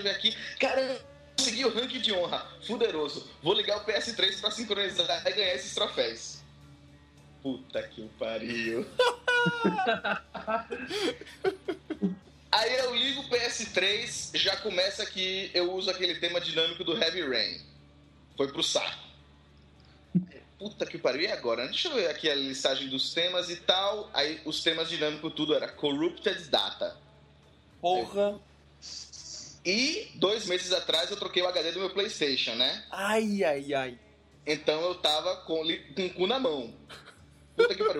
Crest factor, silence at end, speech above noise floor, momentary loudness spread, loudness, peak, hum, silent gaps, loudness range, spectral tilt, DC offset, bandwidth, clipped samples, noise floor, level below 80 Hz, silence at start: 22 dB; 0 s; 28 dB; 11 LU; -29 LUFS; -8 dBFS; none; none; 4 LU; -3 dB/octave; under 0.1%; 15 kHz; under 0.1%; -58 dBFS; -64 dBFS; 0 s